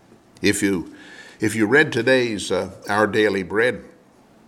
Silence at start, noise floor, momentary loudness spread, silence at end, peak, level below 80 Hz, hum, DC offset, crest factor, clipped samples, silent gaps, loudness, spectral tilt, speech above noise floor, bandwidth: 0.4 s; -52 dBFS; 11 LU; 0.6 s; -2 dBFS; -58 dBFS; none; under 0.1%; 18 dB; under 0.1%; none; -20 LUFS; -4.5 dB/octave; 32 dB; 16 kHz